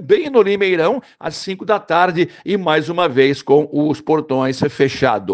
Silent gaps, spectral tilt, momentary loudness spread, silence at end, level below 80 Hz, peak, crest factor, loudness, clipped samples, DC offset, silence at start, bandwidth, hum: none; -6 dB/octave; 6 LU; 0 s; -56 dBFS; 0 dBFS; 16 dB; -16 LUFS; under 0.1%; under 0.1%; 0 s; 9 kHz; none